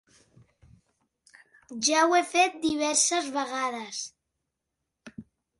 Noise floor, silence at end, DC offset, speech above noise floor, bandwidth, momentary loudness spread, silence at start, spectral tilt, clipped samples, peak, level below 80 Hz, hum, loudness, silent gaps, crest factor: -84 dBFS; 0.35 s; under 0.1%; 58 dB; 11.5 kHz; 21 LU; 1.7 s; -1 dB/octave; under 0.1%; -8 dBFS; -68 dBFS; none; -25 LUFS; none; 22 dB